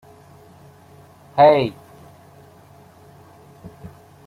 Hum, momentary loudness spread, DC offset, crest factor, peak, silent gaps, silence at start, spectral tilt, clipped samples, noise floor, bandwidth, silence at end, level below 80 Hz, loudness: none; 29 LU; under 0.1%; 22 dB; -2 dBFS; none; 1.35 s; -7 dB/octave; under 0.1%; -48 dBFS; 12.5 kHz; 0.4 s; -60 dBFS; -16 LUFS